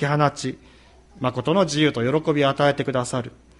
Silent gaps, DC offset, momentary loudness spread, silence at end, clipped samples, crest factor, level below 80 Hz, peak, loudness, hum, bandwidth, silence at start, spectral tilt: none; under 0.1%; 11 LU; 0.3 s; under 0.1%; 18 dB; -54 dBFS; -4 dBFS; -22 LUFS; none; 11.5 kHz; 0 s; -5.5 dB/octave